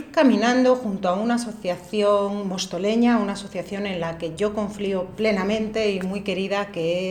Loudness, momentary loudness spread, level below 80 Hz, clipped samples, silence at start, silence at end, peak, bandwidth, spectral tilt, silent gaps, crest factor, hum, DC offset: -23 LUFS; 9 LU; -54 dBFS; under 0.1%; 0 s; 0 s; -6 dBFS; 13.5 kHz; -5.5 dB/octave; none; 16 dB; none; under 0.1%